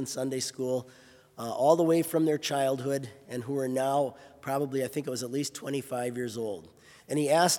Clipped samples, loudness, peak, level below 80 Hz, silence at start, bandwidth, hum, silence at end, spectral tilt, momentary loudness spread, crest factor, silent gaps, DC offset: under 0.1%; -30 LUFS; -8 dBFS; -76 dBFS; 0 s; 18 kHz; none; 0 s; -4.5 dB/octave; 12 LU; 20 dB; none; under 0.1%